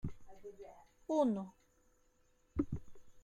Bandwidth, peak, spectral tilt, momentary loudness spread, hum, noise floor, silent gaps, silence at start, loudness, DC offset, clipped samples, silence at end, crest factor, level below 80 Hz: 11 kHz; -22 dBFS; -8.5 dB/octave; 22 LU; none; -72 dBFS; none; 0.05 s; -39 LUFS; under 0.1%; under 0.1%; 0 s; 20 dB; -58 dBFS